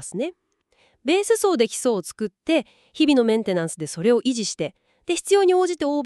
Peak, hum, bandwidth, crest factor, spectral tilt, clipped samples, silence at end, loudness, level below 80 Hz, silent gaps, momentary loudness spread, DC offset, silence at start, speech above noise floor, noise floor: -6 dBFS; none; 13.5 kHz; 16 dB; -4 dB/octave; under 0.1%; 0 s; -22 LUFS; -64 dBFS; none; 13 LU; under 0.1%; 0 s; 42 dB; -63 dBFS